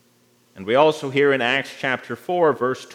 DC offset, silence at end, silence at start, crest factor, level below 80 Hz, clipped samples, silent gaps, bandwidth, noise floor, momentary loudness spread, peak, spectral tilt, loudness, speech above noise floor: under 0.1%; 0 s; 0.55 s; 20 dB; -76 dBFS; under 0.1%; none; 15.5 kHz; -59 dBFS; 8 LU; -2 dBFS; -5 dB/octave; -20 LUFS; 39 dB